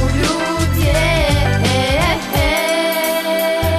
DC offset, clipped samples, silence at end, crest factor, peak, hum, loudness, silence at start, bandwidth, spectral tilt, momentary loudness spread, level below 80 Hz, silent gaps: under 0.1%; under 0.1%; 0 s; 12 dB; -4 dBFS; none; -15 LUFS; 0 s; 14 kHz; -4.5 dB/octave; 3 LU; -24 dBFS; none